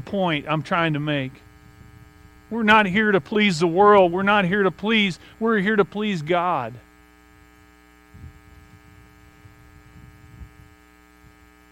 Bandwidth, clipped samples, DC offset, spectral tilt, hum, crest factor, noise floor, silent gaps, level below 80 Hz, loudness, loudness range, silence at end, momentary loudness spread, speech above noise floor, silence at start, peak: 11 kHz; under 0.1%; under 0.1%; -6 dB/octave; none; 20 dB; -52 dBFS; none; -54 dBFS; -20 LUFS; 10 LU; 1.25 s; 10 LU; 32 dB; 0 s; -2 dBFS